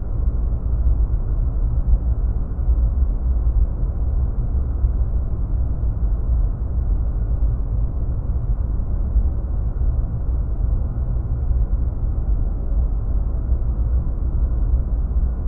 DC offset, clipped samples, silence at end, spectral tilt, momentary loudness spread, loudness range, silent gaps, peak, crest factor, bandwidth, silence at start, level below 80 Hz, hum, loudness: under 0.1%; under 0.1%; 0 s; -13.5 dB/octave; 3 LU; 2 LU; none; -4 dBFS; 14 dB; 1.6 kHz; 0 s; -20 dBFS; none; -23 LUFS